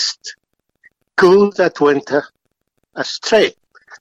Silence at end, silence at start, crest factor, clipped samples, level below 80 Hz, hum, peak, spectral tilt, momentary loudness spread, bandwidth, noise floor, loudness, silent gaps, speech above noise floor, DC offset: 0.5 s; 0 s; 14 dB; under 0.1%; -60 dBFS; none; -2 dBFS; -4 dB/octave; 17 LU; 8.6 kHz; -69 dBFS; -15 LUFS; none; 56 dB; under 0.1%